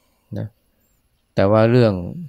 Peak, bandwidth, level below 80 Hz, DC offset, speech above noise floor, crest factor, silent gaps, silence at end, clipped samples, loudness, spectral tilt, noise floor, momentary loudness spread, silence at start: -2 dBFS; 8.2 kHz; -52 dBFS; under 0.1%; 47 dB; 16 dB; none; 0 s; under 0.1%; -16 LUFS; -9 dB/octave; -64 dBFS; 19 LU; 0.3 s